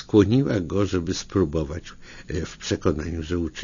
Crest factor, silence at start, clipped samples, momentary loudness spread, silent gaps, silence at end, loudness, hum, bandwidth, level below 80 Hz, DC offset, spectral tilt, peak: 20 dB; 0 s; under 0.1%; 13 LU; none; 0 s; -24 LUFS; none; 7.4 kHz; -40 dBFS; under 0.1%; -6.5 dB/octave; -4 dBFS